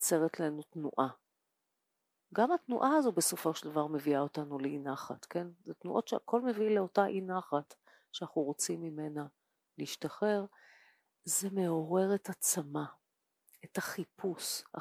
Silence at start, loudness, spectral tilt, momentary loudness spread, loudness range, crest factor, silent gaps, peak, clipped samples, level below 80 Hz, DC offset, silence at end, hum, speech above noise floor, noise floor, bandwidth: 0 s; -35 LUFS; -4 dB/octave; 11 LU; 5 LU; 20 dB; none; -16 dBFS; under 0.1%; -88 dBFS; under 0.1%; 0 s; none; 50 dB; -85 dBFS; 16 kHz